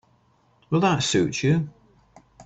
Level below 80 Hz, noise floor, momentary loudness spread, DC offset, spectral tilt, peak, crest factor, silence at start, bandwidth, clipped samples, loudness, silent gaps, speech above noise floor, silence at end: -56 dBFS; -62 dBFS; 6 LU; under 0.1%; -5 dB/octave; -10 dBFS; 16 dB; 0.7 s; 8.4 kHz; under 0.1%; -22 LUFS; none; 41 dB; 0.05 s